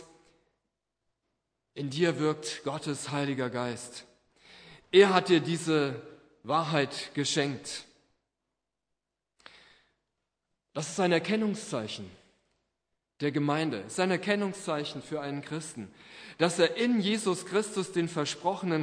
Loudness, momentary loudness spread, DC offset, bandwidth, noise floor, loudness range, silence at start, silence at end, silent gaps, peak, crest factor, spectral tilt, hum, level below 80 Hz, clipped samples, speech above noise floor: -29 LUFS; 16 LU; under 0.1%; 11 kHz; -87 dBFS; 7 LU; 0 s; 0 s; none; -8 dBFS; 24 dB; -4.5 dB/octave; none; -76 dBFS; under 0.1%; 57 dB